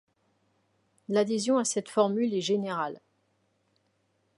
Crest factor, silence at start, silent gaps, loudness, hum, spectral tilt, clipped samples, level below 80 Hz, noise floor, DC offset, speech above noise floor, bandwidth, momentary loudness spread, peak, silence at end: 20 dB; 1.1 s; none; -28 LUFS; none; -4.5 dB/octave; under 0.1%; -80 dBFS; -73 dBFS; under 0.1%; 46 dB; 11.5 kHz; 7 LU; -10 dBFS; 1.4 s